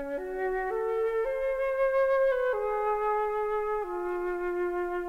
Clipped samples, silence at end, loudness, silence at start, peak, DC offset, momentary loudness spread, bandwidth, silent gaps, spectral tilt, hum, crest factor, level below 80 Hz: under 0.1%; 0 s; -29 LUFS; 0 s; -18 dBFS; 0.1%; 7 LU; 13.5 kHz; none; -5.5 dB/octave; 50 Hz at -65 dBFS; 10 dB; -52 dBFS